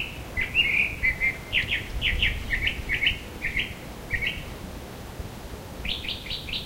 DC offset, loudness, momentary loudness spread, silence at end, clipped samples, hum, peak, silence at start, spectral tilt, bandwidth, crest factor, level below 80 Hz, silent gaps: under 0.1%; -26 LUFS; 17 LU; 0 s; under 0.1%; none; -8 dBFS; 0 s; -3 dB/octave; 16 kHz; 20 dB; -38 dBFS; none